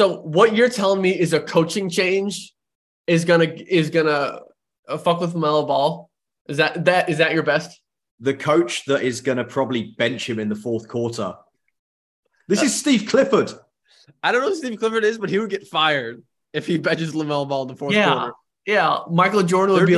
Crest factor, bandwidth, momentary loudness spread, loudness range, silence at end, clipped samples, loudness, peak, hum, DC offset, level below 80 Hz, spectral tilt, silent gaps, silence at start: 18 dB; 12.5 kHz; 10 LU; 3 LU; 0 s; under 0.1%; -20 LUFS; -2 dBFS; none; under 0.1%; -64 dBFS; -5 dB/octave; 2.75-3.04 s, 4.79-4.83 s, 6.41-6.45 s, 8.11-8.18 s, 11.79-12.23 s; 0 s